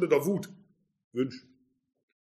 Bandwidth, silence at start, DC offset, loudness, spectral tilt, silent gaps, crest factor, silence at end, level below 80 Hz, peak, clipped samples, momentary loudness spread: 14.5 kHz; 0 s; under 0.1%; -31 LUFS; -6.5 dB/octave; 1.04-1.11 s; 22 dB; 0.9 s; -78 dBFS; -12 dBFS; under 0.1%; 19 LU